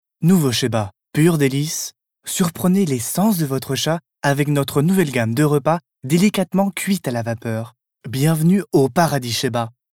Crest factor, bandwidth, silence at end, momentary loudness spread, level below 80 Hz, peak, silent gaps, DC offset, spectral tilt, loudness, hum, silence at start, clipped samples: 16 dB; 18 kHz; 0.25 s; 9 LU; -58 dBFS; -2 dBFS; none; under 0.1%; -5.5 dB/octave; -19 LUFS; none; 0.2 s; under 0.1%